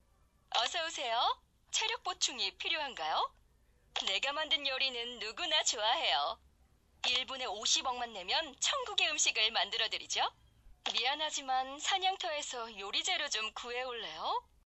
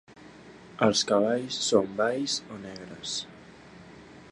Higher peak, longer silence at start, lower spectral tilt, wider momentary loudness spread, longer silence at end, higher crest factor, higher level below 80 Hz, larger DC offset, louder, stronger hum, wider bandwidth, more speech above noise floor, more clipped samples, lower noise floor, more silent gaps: second, -14 dBFS vs -6 dBFS; first, 0.5 s vs 0.1 s; second, 1.5 dB/octave vs -3.5 dB/octave; second, 9 LU vs 22 LU; first, 0.25 s vs 0 s; about the same, 22 dB vs 24 dB; about the same, -68 dBFS vs -66 dBFS; neither; second, -33 LUFS vs -27 LUFS; neither; first, 13 kHz vs 11.5 kHz; first, 34 dB vs 22 dB; neither; first, -69 dBFS vs -49 dBFS; neither